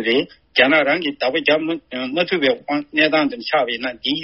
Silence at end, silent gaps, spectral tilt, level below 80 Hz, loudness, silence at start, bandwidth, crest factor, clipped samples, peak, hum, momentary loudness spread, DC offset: 0 s; none; -1 dB/octave; -60 dBFS; -18 LUFS; 0 s; 6 kHz; 18 dB; under 0.1%; 0 dBFS; none; 8 LU; under 0.1%